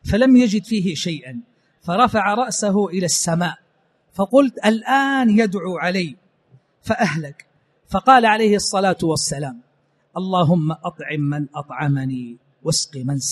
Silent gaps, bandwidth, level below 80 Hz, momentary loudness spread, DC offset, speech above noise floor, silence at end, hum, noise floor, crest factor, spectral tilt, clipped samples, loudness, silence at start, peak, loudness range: none; 13 kHz; -48 dBFS; 16 LU; under 0.1%; 44 dB; 0 s; none; -62 dBFS; 20 dB; -4.5 dB/octave; under 0.1%; -19 LUFS; 0.05 s; 0 dBFS; 4 LU